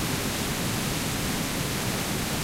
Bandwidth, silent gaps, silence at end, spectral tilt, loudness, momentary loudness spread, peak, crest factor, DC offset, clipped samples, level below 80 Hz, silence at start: 16 kHz; none; 0 s; -3.5 dB/octave; -27 LUFS; 0 LU; -16 dBFS; 12 dB; under 0.1%; under 0.1%; -42 dBFS; 0 s